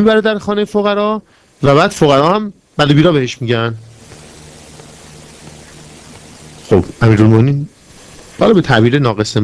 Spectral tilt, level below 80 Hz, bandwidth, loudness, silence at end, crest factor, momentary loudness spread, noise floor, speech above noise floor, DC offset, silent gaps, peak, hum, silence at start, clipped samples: -6.5 dB/octave; -42 dBFS; 11 kHz; -12 LUFS; 0 s; 14 dB; 9 LU; -38 dBFS; 27 dB; under 0.1%; none; 0 dBFS; none; 0 s; 0.7%